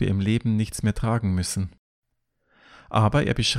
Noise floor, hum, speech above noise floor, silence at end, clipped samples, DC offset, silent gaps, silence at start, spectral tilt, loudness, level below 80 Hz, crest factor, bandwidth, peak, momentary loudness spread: -72 dBFS; none; 50 dB; 0 s; under 0.1%; under 0.1%; 1.79-2.02 s; 0 s; -5.5 dB/octave; -24 LUFS; -42 dBFS; 18 dB; 14 kHz; -6 dBFS; 7 LU